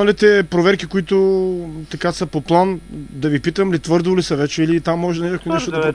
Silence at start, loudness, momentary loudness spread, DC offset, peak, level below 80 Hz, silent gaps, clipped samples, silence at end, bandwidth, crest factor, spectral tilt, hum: 0 s; -17 LUFS; 9 LU; under 0.1%; 0 dBFS; -44 dBFS; none; under 0.1%; 0 s; 10.5 kHz; 16 dB; -6 dB/octave; none